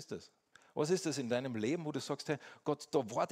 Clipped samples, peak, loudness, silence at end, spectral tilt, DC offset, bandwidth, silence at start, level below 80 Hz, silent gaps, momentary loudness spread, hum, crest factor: under 0.1%; -18 dBFS; -37 LUFS; 0.05 s; -5 dB/octave; under 0.1%; 16 kHz; 0 s; -80 dBFS; none; 8 LU; none; 18 dB